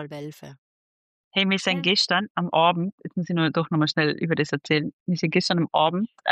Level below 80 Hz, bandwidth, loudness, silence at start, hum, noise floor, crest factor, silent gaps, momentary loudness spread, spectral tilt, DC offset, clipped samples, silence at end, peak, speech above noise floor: -70 dBFS; 9.2 kHz; -23 LUFS; 0 s; none; under -90 dBFS; 18 dB; 0.58-1.31 s, 2.30-2.35 s, 2.92-2.98 s, 4.93-5.06 s; 8 LU; -5 dB/octave; under 0.1%; under 0.1%; 0 s; -8 dBFS; over 66 dB